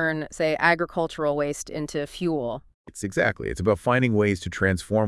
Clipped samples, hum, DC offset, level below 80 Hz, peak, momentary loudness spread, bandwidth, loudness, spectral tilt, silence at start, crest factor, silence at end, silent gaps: under 0.1%; none; under 0.1%; -50 dBFS; -4 dBFS; 10 LU; 12 kHz; -25 LUFS; -5.5 dB/octave; 0 s; 20 dB; 0 s; 2.74-2.84 s